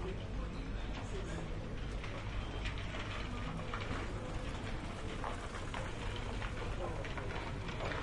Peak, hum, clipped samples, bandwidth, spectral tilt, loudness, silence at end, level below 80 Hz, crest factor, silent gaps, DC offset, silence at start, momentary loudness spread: -24 dBFS; none; under 0.1%; 11.5 kHz; -5.5 dB/octave; -42 LUFS; 0 s; -44 dBFS; 16 dB; none; under 0.1%; 0 s; 2 LU